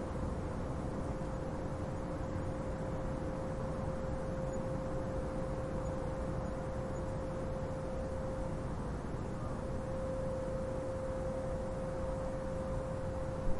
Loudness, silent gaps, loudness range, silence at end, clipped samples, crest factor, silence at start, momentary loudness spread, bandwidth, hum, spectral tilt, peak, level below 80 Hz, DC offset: -40 LUFS; none; 1 LU; 0 s; under 0.1%; 18 dB; 0 s; 2 LU; 11.5 kHz; none; -7.5 dB/octave; -20 dBFS; -44 dBFS; under 0.1%